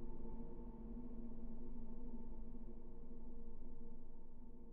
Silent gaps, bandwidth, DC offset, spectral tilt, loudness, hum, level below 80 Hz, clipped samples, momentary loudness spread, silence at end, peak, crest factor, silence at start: none; 1.2 kHz; under 0.1%; -10 dB/octave; -56 LUFS; none; -50 dBFS; under 0.1%; 7 LU; 0 s; -36 dBFS; 8 dB; 0 s